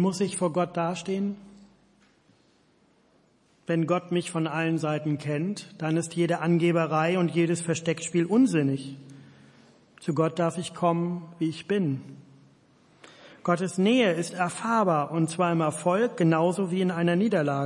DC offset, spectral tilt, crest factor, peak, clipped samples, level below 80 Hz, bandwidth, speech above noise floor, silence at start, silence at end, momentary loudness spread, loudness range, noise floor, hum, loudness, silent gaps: under 0.1%; -6 dB/octave; 18 dB; -8 dBFS; under 0.1%; -74 dBFS; 11.5 kHz; 38 dB; 0 s; 0 s; 8 LU; 7 LU; -63 dBFS; none; -26 LUFS; none